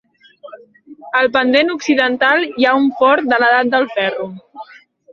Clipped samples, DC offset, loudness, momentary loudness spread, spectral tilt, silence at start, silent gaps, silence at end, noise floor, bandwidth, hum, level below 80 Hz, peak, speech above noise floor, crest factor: under 0.1%; under 0.1%; -14 LUFS; 7 LU; -4 dB/octave; 0.45 s; none; 0.5 s; -43 dBFS; 7 kHz; none; -62 dBFS; -2 dBFS; 29 dB; 14 dB